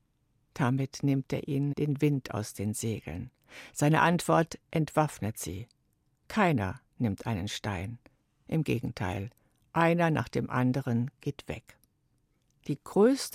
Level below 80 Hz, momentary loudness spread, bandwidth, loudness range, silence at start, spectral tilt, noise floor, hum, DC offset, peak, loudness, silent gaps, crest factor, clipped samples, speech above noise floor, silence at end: -60 dBFS; 17 LU; 16 kHz; 4 LU; 0.55 s; -6 dB/octave; -73 dBFS; none; under 0.1%; -10 dBFS; -30 LUFS; none; 20 dB; under 0.1%; 43 dB; 0.05 s